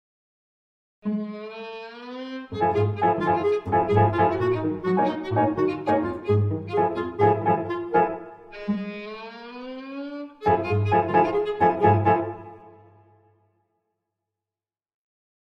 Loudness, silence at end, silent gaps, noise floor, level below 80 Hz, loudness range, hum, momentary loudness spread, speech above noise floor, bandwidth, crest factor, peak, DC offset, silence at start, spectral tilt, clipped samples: -23 LUFS; 2.85 s; none; under -90 dBFS; -56 dBFS; 5 LU; none; 17 LU; over 68 dB; 6.2 kHz; 20 dB; -6 dBFS; under 0.1%; 1.05 s; -9 dB/octave; under 0.1%